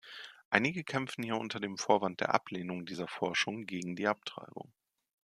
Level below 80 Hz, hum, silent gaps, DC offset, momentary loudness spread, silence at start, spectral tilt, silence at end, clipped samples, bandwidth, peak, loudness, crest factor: -78 dBFS; none; 0.45-0.51 s; under 0.1%; 17 LU; 0.05 s; -4 dB/octave; 0.75 s; under 0.1%; 14 kHz; -6 dBFS; -34 LUFS; 30 dB